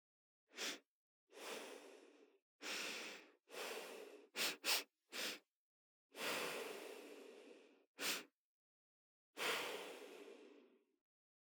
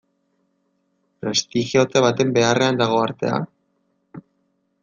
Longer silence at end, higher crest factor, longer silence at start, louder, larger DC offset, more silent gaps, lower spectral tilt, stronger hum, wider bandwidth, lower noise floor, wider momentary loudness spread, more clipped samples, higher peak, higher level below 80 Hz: first, 0.9 s vs 0.6 s; first, 24 dB vs 18 dB; second, 0.55 s vs 1.25 s; second, -46 LUFS vs -19 LUFS; neither; first, 0.88-1.27 s, 2.42-2.59 s, 5.56-6.09 s, 7.87-7.95 s, 8.34-9.33 s vs none; second, 0 dB/octave vs -4.5 dB/octave; neither; first, over 20 kHz vs 9.8 kHz; about the same, -70 dBFS vs -68 dBFS; first, 21 LU vs 8 LU; neither; second, -26 dBFS vs -4 dBFS; second, under -90 dBFS vs -62 dBFS